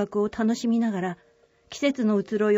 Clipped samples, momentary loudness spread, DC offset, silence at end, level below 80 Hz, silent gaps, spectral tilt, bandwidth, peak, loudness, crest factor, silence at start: under 0.1%; 10 LU; under 0.1%; 0 s; -62 dBFS; none; -6 dB/octave; 8 kHz; -10 dBFS; -25 LUFS; 16 dB; 0 s